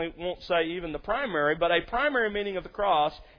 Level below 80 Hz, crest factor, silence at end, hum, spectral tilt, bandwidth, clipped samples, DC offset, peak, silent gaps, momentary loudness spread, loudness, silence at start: -50 dBFS; 18 dB; 0.15 s; none; -6.5 dB/octave; 5.4 kHz; under 0.1%; under 0.1%; -10 dBFS; none; 8 LU; -27 LUFS; 0 s